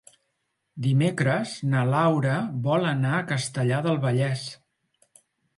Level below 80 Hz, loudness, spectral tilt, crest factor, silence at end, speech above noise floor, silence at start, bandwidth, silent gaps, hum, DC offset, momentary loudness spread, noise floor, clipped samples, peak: -66 dBFS; -25 LUFS; -6.5 dB/octave; 16 dB; 1 s; 53 dB; 0.75 s; 11.5 kHz; none; none; under 0.1%; 6 LU; -77 dBFS; under 0.1%; -10 dBFS